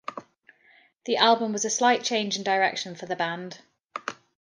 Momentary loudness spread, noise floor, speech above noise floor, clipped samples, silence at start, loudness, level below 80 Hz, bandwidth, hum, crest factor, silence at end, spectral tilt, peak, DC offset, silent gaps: 20 LU; -60 dBFS; 35 dB; under 0.1%; 0.1 s; -25 LUFS; -78 dBFS; 10.5 kHz; none; 22 dB; 0.3 s; -2 dB/octave; -4 dBFS; under 0.1%; 3.84-3.89 s